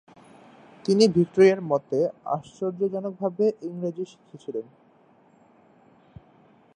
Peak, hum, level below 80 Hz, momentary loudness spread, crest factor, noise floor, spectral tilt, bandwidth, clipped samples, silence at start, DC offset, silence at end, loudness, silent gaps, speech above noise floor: -4 dBFS; none; -68 dBFS; 16 LU; 22 dB; -58 dBFS; -6.5 dB/octave; 10 kHz; under 0.1%; 0.85 s; under 0.1%; 2.15 s; -24 LUFS; none; 34 dB